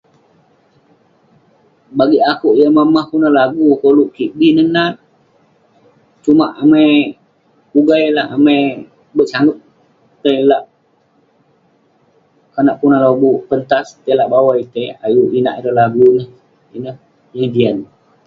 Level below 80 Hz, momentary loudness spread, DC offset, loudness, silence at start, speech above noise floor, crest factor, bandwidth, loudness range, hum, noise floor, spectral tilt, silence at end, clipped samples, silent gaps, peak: -58 dBFS; 13 LU; under 0.1%; -13 LUFS; 1.95 s; 44 dB; 14 dB; 7.2 kHz; 5 LU; none; -56 dBFS; -7.5 dB/octave; 0.4 s; under 0.1%; none; 0 dBFS